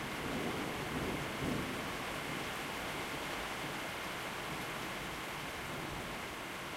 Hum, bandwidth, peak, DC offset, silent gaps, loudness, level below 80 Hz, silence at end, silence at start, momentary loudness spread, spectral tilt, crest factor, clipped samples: none; 16 kHz; -26 dBFS; under 0.1%; none; -40 LUFS; -58 dBFS; 0 s; 0 s; 3 LU; -3.5 dB/octave; 16 dB; under 0.1%